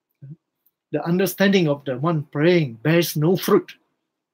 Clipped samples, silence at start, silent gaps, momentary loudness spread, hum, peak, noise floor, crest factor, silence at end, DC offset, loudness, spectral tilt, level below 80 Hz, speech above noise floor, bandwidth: under 0.1%; 0.25 s; none; 6 LU; none; -4 dBFS; -75 dBFS; 18 dB; 0.6 s; under 0.1%; -20 LUFS; -6 dB/octave; -70 dBFS; 56 dB; 16.5 kHz